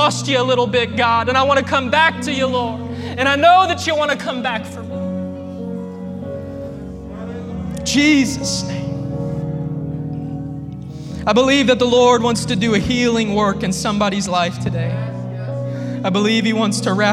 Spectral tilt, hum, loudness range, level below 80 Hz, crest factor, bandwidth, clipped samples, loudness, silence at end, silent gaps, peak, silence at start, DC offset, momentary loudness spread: -4.5 dB/octave; none; 8 LU; -42 dBFS; 18 dB; 14.5 kHz; under 0.1%; -17 LUFS; 0 s; none; 0 dBFS; 0 s; under 0.1%; 15 LU